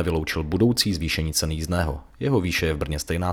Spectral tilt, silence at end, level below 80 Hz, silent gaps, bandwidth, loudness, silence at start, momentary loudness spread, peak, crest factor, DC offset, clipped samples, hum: -4.5 dB/octave; 0 s; -38 dBFS; none; over 20 kHz; -24 LUFS; 0 s; 6 LU; -4 dBFS; 20 dB; under 0.1%; under 0.1%; none